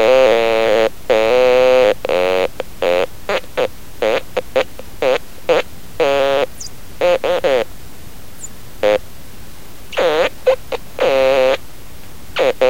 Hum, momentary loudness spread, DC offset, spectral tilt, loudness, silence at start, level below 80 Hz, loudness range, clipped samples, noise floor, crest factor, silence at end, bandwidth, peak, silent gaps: none; 13 LU; 4%; -3.5 dB/octave; -16 LUFS; 0 s; -42 dBFS; 5 LU; under 0.1%; -37 dBFS; 16 dB; 0 s; 17 kHz; 0 dBFS; none